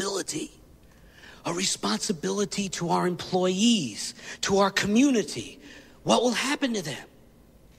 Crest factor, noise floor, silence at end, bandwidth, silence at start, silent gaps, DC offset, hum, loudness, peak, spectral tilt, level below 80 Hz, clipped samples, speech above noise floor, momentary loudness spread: 20 dB; -54 dBFS; 0.7 s; 15.5 kHz; 0 s; none; under 0.1%; none; -26 LUFS; -6 dBFS; -3.5 dB/octave; -58 dBFS; under 0.1%; 28 dB; 14 LU